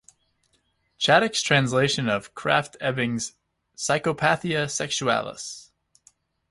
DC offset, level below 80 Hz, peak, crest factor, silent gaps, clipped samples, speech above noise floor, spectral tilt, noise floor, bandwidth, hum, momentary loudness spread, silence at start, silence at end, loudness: under 0.1%; -60 dBFS; -4 dBFS; 22 dB; none; under 0.1%; 46 dB; -3.5 dB/octave; -69 dBFS; 11.5 kHz; none; 13 LU; 1 s; 0.85 s; -23 LUFS